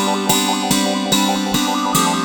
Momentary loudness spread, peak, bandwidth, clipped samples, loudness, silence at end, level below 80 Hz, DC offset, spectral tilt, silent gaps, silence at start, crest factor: 2 LU; 0 dBFS; over 20 kHz; under 0.1%; -16 LUFS; 0 s; -46 dBFS; under 0.1%; -3 dB/octave; none; 0 s; 16 dB